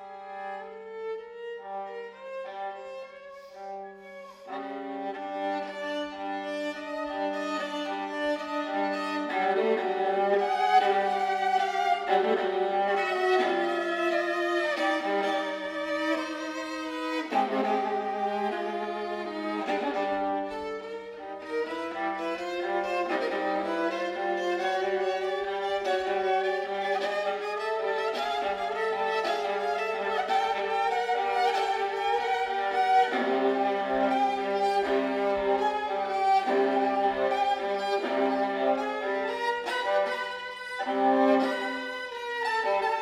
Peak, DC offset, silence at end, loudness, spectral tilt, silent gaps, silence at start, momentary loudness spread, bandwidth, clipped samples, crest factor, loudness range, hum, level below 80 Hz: -10 dBFS; under 0.1%; 0 s; -28 LUFS; -4 dB/octave; none; 0 s; 12 LU; 14 kHz; under 0.1%; 18 dB; 9 LU; none; -68 dBFS